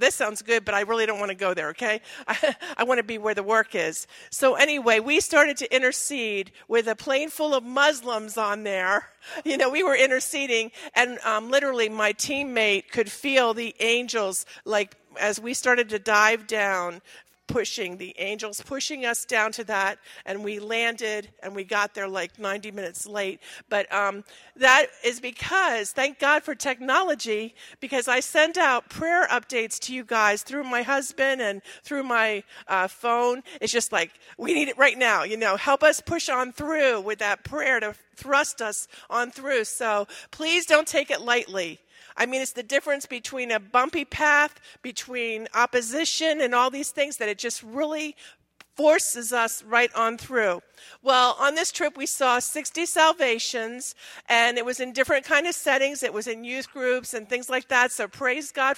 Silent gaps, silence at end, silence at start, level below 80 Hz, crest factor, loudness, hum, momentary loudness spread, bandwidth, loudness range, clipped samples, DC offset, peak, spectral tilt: none; 0 s; 0 s; -64 dBFS; 22 dB; -24 LUFS; none; 11 LU; 16 kHz; 4 LU; under 0.1%; under 0.1%; -2 dBFS; -1.5 dB/octave